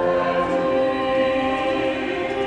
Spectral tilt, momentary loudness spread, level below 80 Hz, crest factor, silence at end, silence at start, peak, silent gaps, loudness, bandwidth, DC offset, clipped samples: -6 dB/octave; 3 LU; -48 dBFS; 12 dB; 0 s; 0 s; -10 dBFS; none; -21 LUFS; 9.4 kHz; under 0.1%; under 0.1%